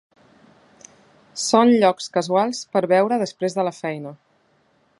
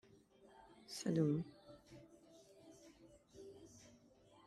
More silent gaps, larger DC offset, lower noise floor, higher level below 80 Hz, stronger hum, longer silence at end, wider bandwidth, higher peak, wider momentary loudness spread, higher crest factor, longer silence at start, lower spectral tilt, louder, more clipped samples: neither; neither; second, -62 dBFS vs -68 dBFS; first, -72 dBFS vs -78 dBFS; neither; about the same, 0.85 s vs 0.8 s; second, 11.5 kHz vs 13.5 kHz; first, -2 dBFS vs -24 dBFS; second, 14 LU vs 27 LU; about the same, 20 dB vs 22 dB; first, 1.35 s vs 0.9 s; second, -4.5 dB/octave vs -6.5 dB/octave; first, -20 LUFS vs -41 LUFS; neither